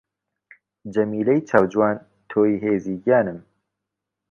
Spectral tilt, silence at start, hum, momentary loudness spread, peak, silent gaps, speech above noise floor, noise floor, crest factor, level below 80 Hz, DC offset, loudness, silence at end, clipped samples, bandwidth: -8.5 dB/octave; 0.85 s; none; 11 LU; -2 dBFS; none; 63 dB; -83 dBFS; 22 dB; -60 dBFS; under 0.1%; -21 LUFS; 0.9 s; under 0.1%; 7 kHz